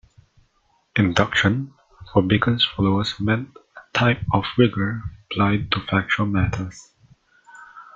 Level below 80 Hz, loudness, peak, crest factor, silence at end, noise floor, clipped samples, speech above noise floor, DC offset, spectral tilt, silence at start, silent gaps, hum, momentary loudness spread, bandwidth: -46 dBFS; -21 LUFS; -2 dBFS; 20 dB; 0.1 s; -64 dBFS; under 0.1%; 44 dB; under 0.1%; -6 dB/octave; 0.95 s; none; none; 11 LU; 7.6 kHz